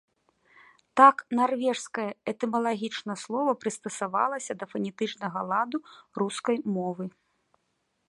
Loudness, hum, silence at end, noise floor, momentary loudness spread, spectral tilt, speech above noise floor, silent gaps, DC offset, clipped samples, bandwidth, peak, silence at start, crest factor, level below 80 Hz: -27 LUFS; none; 1 s; -76 dBFS; 14 LU; -4.5 dB/octave; 49 dB; none; under 0.1%; under 0.1%; 11.5 kHz; -6 dBFS; 0.95 s; 24 dB; -78 dBFS